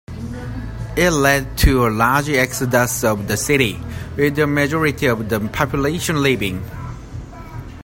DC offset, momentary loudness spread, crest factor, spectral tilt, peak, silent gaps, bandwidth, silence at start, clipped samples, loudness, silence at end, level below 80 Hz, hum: under 0.1%; 16 LU; 18 dB; -4.5 dB/octave; 0 dBFS; none; 16.5 kHz; 0.1 s; under 0.1%; -17 LUFS; 0 s; -30 dBFS; none